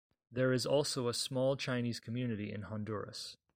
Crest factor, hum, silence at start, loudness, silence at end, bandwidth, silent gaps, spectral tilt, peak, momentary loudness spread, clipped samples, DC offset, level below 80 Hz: 16 dB; none; 0.3 s; -36 LUFS; 0.2 s; 16 kHz; none; -5 dB/octave; -20 dBFS; 10 LU; under 0.1%; under 0.1%; -70 dBFS